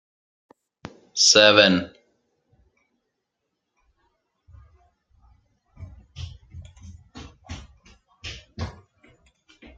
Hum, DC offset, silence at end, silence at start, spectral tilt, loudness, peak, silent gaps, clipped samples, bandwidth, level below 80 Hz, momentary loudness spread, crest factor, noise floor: none; under 0.1%; 1.05 s; 1.15 s; -2 dB/octave; -16 LUFS; -2 dBFS; none; under 0.1%; 11 kHz; -52 dBFS; 31 LU; 26 dB; -80 dBFS